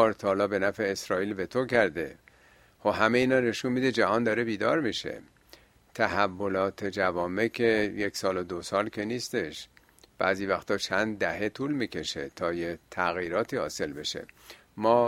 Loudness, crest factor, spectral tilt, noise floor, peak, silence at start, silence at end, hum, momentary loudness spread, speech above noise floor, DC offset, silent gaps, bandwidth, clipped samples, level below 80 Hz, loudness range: -28 LUFS; 22 dB; -4.5 dB/octave; -59 dBFS; -6 dBFS; 0 s; 0 s; none; 9 LU; 31 dB; under 0.1%; none; 16 kHz; under 0.1%; -62 dBFS; 4 LU